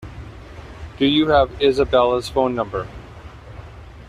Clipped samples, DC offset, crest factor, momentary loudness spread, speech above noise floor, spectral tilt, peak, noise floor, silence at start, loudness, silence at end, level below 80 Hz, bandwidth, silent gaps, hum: under 0.1%; under 0.1%; 18 dB; 23 LU; 21 dB; -6 dB/octave; -4 dBFS; -38 dBFS; 0 s; -18 LUFS; 0.05 s; -40 dBFS; 13.5 kHz; none; none